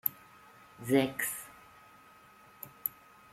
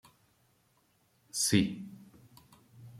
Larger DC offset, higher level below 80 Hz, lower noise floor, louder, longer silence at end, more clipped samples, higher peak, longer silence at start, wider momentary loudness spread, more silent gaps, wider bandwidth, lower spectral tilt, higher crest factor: neither; second, -74 dBFS vs -66 dBFS; second, -58 dBFS vs -71 dBFS; second, -33 LUFS vs -30 LUFS; first, 0.45 s vs 0 s; neither; first, -10 dBFS vs -14 dBFS; second, 0.05 s vs 1.35 s; first, 27 LU vs 23 LU; neither; about the same, 16.5 kHz vs 15.5 kHz; about the same, -4.5 dB/octave vs -3.5 dB/octave; about the same, 28 dB vs 24 dB